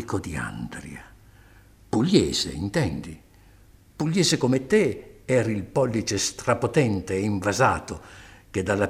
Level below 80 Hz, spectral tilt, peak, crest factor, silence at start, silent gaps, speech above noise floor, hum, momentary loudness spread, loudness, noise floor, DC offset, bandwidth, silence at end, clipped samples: -50 dBFS; -5 dB/octave; -4 dBFS; 20 dB; 0 s; none; 29 dB; none; 17 LU; -24 LUFS; -53 dBFS; under 0.1%; 15.5 kHz; 0 s; under 0.1%